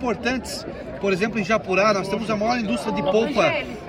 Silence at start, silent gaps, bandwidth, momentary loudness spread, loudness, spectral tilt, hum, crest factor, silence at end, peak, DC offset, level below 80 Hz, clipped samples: 0 s; none; 16 kHz; 8 LU; -22 LUFS; -5 dB/octave; none; 16 dB; 0 s; -6 dBFS; under 0.1%; -46 dBFS; under 0.1%